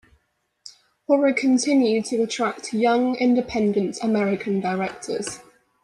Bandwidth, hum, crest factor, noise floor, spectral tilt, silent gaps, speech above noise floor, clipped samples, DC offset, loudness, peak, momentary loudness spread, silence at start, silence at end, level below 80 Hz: 11.5 kHz; none; 16 dB; -69 dBFS; -5 dB/octave; none; 48 dB; under 0.1%; under 0.1%; -22 LUFS; -6 dBFS; 10 LU; 0.65 s; 0.4 s; -60 dBFS